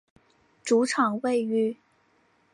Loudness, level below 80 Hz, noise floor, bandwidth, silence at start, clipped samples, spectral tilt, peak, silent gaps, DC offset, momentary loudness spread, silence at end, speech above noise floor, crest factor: -25 LUFS; -76 dBFS; -66 dBFS; 11.5 kHz; 0.65 s; under 0.1%; -4.5 dB/octave; -10 dBFS; none; under 0.1%; 12 LU; 0.8 s; 41 dB; 18 dB